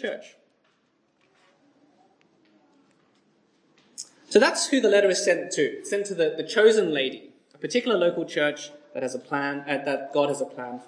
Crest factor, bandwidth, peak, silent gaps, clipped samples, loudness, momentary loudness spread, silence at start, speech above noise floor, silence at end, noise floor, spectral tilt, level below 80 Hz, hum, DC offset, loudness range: 22 dB; 10.5 kHz; -4 dBFS; none; under 0.1%; -24 LUFS; 18 LU; 0 s; 44 dB; 0.05 s; -68 dBFS; -3 dB/octave; -82 dBFS; none; under 0.1%; 5 LU